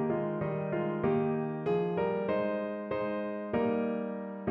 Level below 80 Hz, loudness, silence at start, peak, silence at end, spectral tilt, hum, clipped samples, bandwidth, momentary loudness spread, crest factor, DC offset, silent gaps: -64 dBFS; -32 LUFS; 0 s; -18 dBFS; 0 s; -10.5 dB/octave; none; under 0.1%; 5.6 kHz; 5 LU; 14 dB; under 0.1%; none